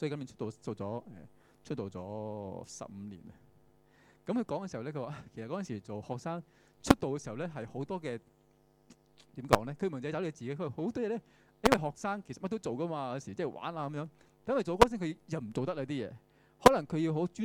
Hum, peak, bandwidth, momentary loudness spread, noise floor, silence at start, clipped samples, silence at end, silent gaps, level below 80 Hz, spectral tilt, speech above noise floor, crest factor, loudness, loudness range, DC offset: none; -6 dBFS; 19 kHz; 17 LU; -67 dBFS; 0 s; under 0.1%; 0 s; none; -56 dBFS; -5.5 dB/octave; 33 dB; 28 dB; -34 LUFS; 10 LU; under 0.1%